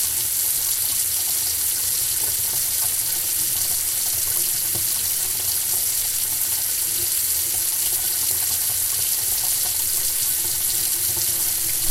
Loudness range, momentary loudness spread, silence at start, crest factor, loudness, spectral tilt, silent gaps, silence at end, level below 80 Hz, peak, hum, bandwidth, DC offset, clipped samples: 0 LU; 1 LU; 0 s; 20 dB; -19 LUFS; 1 dB/octave; none; 0 s; -50 dBFS; -2 dBFS; none; 16 kHz; under 0.1%; under 0.1%